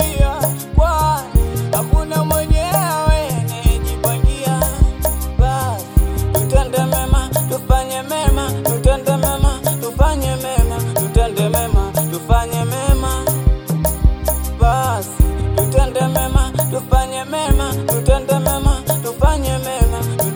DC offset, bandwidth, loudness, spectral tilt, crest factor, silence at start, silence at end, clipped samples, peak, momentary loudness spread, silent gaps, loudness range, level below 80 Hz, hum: under 0.1%; 19.5 kHz; -17 LUFS; -5.5 dB/octave; 14 dB; 0 s; 0 s; under 0.1%; 0 dBFS; 3 LU; none; 1 LU; -18 dBFS; none